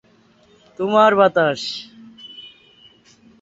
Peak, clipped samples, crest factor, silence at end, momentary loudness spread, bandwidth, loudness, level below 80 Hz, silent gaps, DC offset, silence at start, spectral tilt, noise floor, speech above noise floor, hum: -2 dBFS; under 0.1%; 20 dB; 0.95 s; 26 LU; 8 kHz; -17 LUFS; -64 dBFS; none; under 0.1%; 0.8 s; -5 dB/octave; -54 dBFS; 38 dB; none